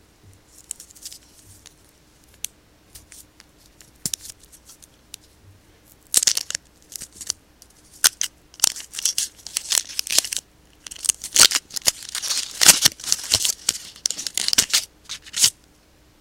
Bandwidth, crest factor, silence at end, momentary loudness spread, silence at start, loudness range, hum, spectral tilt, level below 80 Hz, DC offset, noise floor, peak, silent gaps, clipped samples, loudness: 17 kHz; 24 dB; 0.7 s; 22 LU; 1 s; 19 LU; none; 1.5 dB/octave; -56 dBFS; under 0.1%; -55 dBFS; 0 dBFS; none; under 0.1%; -19 LUFS